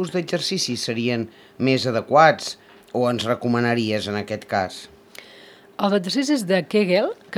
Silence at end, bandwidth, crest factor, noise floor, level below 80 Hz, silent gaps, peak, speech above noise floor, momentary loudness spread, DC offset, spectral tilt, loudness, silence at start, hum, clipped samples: 0 s; 17 kHz; 20 dB; -47 dBFS; -66 dBFS; none; -2 dBFS; 26 dB; 14 LU; under 0.1%; -5 dB/octave; -21 LUFS; 0 s; none; under 0.1%